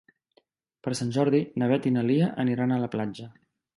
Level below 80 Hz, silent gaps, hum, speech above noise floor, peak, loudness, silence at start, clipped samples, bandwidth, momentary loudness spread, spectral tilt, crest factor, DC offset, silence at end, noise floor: -66 dBFS; none; none; 42 dB; -10 dBFS; -26 LUFS; 0.85 s; under 0.1%; 11.5 kHz; 12 LU; -7 dB/octave; 16 dB; under 0.1%; 0.45 s; -67 dBFS